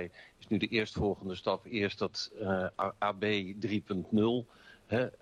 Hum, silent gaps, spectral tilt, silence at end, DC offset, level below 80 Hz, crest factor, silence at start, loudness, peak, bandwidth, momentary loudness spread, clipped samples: none; none; -6 dB/octave; 0.1 s; under 0.1%; -60 dBFS; 16 dB; 0 s; -33 LUFS; -18 dBFS; 10.5 kHz; 6 LU; under 0.1%